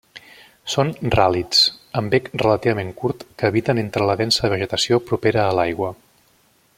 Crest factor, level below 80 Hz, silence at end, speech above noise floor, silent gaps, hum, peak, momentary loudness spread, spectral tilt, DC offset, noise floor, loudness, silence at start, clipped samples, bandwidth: 20 dB; -48 dBFS; 0.85 s; 39 dB; none; none; 0 dBFS; 10 LU; -4.5 dB/octave; under 0.1%; -58 dBFS; -19 LUFS; 0.15 s; under 0.1%; 16 kHz